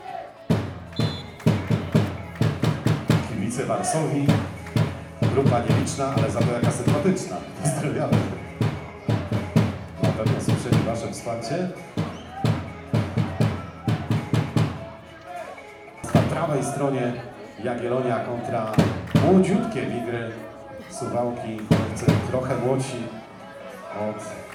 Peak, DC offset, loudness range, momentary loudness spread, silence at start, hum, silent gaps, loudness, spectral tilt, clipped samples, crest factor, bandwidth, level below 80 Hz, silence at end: -4 dBFS; under 0.1%; 3 LU; 14 LU; 0 s; none; none; -24 LUFS; -6.5 dB/octave; under 0.1%; 20 dB; 16.5 kHz; -54 dBFS; 0 s